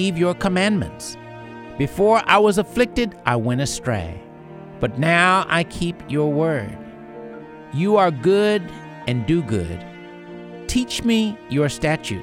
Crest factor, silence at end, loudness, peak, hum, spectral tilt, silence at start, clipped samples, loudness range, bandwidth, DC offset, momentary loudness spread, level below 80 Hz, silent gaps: 20 dB; 0 s; -20 LUFS; 0 dBFS; none; -5.5 dB/octave; 0 s; under 0.1%; 3 LU; 16.5 kHz; under 0.1%; 21 LU; -42 dBFS; none